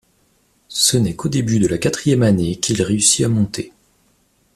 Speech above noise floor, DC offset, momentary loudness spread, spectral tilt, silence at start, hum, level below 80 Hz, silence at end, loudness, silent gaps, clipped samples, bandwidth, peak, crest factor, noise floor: 43 dB; under 0.1%; 9 LU; -4.5 dB/octave; 0.7 s; none; -46 dBFS; 0.85 s; -17 LUFS; none; under 0.1%; 14.5 kHz; -2 dBFS; 16 dB; -60 dBFS